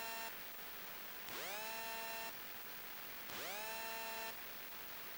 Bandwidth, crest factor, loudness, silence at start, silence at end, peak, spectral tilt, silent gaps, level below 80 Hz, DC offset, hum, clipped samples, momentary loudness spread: 16.5 kHz; 22 dB; -45 LUFS; 0 s; 0 s; -26 dBFS; -1 dB/octave; none; -76 dBFS; under 0.1%; none; under 0.1%; 3 LU